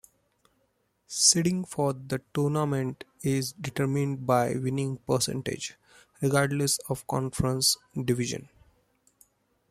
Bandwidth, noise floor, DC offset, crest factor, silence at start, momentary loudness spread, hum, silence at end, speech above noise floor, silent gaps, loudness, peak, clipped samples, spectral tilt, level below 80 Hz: 15 kHz; -73 dBFS; under 0.1%; 22 dB; 1.1 s; 11 LU; none; 1.25 s; 45 dB; none; -27 LUFS; -8 dBFS; under 0.1%; -4 dB/octave; -58 dBFS